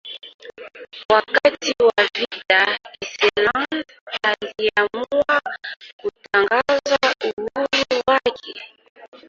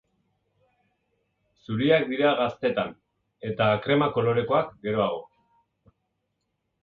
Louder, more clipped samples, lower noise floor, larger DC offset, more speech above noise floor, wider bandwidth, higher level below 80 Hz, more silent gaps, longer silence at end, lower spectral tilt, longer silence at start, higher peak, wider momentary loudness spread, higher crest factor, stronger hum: first, -19 LUFS vs -25 LUFS; neither; second, -38 dBFS vs -78 dBFS; neither; second, 19 dB vs 54 dB; first, 7.6 kHz vs 4.9 kHz; about the same, -58 dBFS vs -62 dBFS; first, 0.34-0.39 s, 1.05-1.09 s, 4.01-4.07 s, 5.76-5.80 s, 5.93-5.99 s, 7.33-7.37 s, 8.90-8.95 s, 9.08-9.12 s vs none; second, 0.1 s vs 1.6 s; second, -2.5 dB/octave vs -8.5 dB/octave; second, 0.05 s vs 1.7 s; first, -2 dBFS vs -8 dBFS; first, 19 LU vs 12 LU; about the same, 20 dB vs 20 dB; neither